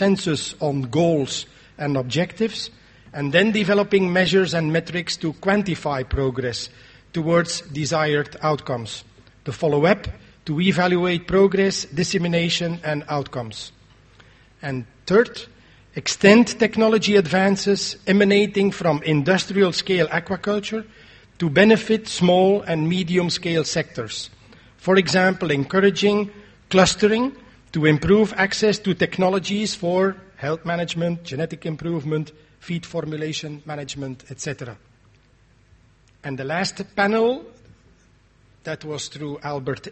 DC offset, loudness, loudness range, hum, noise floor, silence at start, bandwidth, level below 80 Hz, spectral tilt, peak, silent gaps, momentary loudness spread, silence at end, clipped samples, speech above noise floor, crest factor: under 0.1%; -21 LUFS; 8 LU; none; -56 dBFS; 0 s; 8.8 kHz; -48 dBFS; -5 dB/octave; 0 dBFS; none; 14 LU; 0 s; under 0.1%; 36 dB; 22 dB